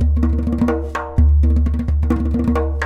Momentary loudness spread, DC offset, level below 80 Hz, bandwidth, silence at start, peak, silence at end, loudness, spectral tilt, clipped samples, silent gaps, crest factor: 5 LU; under 0.1%; -18 dBFS; 3.8 kHz; 0 s; -4 dBFS; 0 s; -18 LUFS; -9 dB/octave; under 0.1%; none; 12 dB